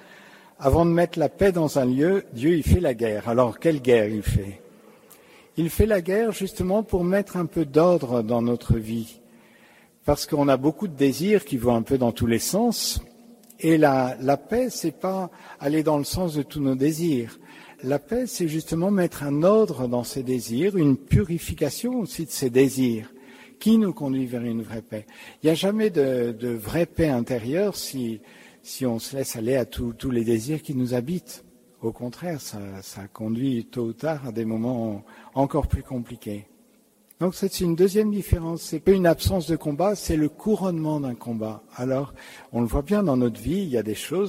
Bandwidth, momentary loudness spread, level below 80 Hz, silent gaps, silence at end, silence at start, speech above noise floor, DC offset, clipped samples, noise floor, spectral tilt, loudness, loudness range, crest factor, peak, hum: 16 kHz; 12 LU; -40 dBFS; none; 0 s; 0.1 s; 36 dB; under 0.1%; under 0.1%; -59 dBFS; -6 dB/octave; -24 LUFS; 6 LU; 20 dB; -4 dBFS; none